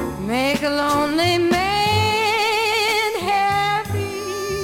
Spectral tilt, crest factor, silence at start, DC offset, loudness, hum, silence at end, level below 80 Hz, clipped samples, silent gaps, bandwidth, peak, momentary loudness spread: -4 dB/octave; 14 dB; 0 s; under 0.1%; -19 LUFS; none; 0 s; -44 dBFS; under 0.1%; none; 17 kHz; -6 dBFS; 7 LU